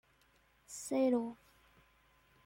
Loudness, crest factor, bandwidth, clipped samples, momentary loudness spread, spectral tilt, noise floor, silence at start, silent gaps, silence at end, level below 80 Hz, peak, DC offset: -36 LUFS; 18 dB; 16.5 kHz; under 0.1%; 19 LU; -4.5 dB/octave; -71 dBFS; 0.7 s; none; 1.1 s; -76 dBFS; -22 dBFS; under 0.1%